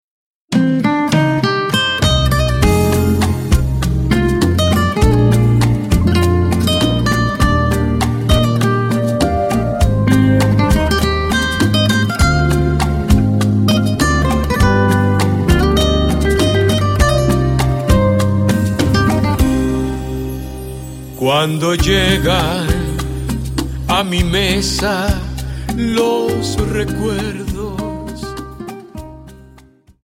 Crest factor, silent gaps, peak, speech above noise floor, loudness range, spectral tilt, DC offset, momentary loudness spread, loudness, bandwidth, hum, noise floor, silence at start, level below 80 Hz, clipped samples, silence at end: 14 dB; none; 0 dBFS; 31 dB; 4 LU; -5.5 dB/octave; under 0.1%; 10 LU; -14 LUFS; 16.5 kHz; none; -45 dBFS; 0.5 s; -22 dBFS; under 0.1%; 0.6 s